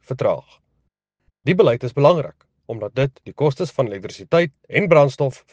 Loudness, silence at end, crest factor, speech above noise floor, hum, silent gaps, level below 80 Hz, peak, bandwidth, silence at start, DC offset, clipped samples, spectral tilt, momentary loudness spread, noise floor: -19 LUFS; 0.2 s; 20 dB; 53 dB; none; none; -58 dBFS; 0 dBFS; 8.8 kHz; 0.1 s; under 0.1%; under 0.1%; -7 dB/octave; 13 LU; -71 dBFS